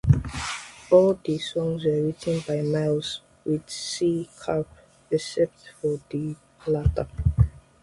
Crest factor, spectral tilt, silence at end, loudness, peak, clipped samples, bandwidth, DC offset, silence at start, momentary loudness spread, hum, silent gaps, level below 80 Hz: 20 dB; -6.5 dB/octave; 0.25 s; -26 LUFS; -4 dBFS; under 0.1%; 11.5 kHz; under 0.1%; 0.05 s; 10 LU; none; none; -36 dBFS